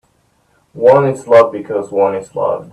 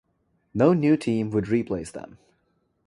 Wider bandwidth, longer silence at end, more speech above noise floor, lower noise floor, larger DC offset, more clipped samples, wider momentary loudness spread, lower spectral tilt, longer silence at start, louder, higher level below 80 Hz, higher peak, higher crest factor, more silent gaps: about the same, 10.5 kHz vs 11.5 kHz; second, 0.1 s vs 0.8 s; about the same, 45 dB vs 47 dB; second, -57 dBFS vs -70 dBFS; neither; neither; second, 9 LU vs 16 LU; about the same, -7 dB/octave vs -8 dB/octave; first, 0.75 s vs 0.55 s; first, -13 LUFS vs -23 LUFS; about the same, -58 dBFS vs -56 dBFS; first, 0 dBFS vs -6 dBFS; second, 14 dB vs 20 dB; neither